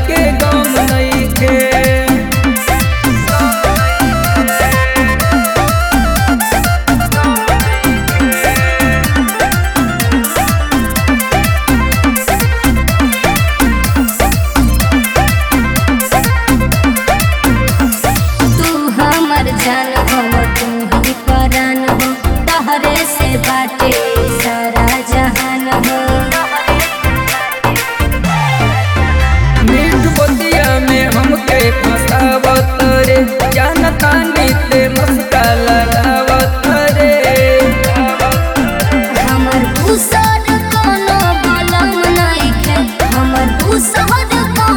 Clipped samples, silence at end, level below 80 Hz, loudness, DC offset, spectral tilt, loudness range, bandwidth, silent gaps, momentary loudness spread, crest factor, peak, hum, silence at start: under 0.1%; 0 s; -18 dBFS; -11 LUFS; 0.6%; -4.5 dB/octave; 2 LU; over 20 kHz; none; 3 LU; 10 dB; 0 dBFS; none; 0 s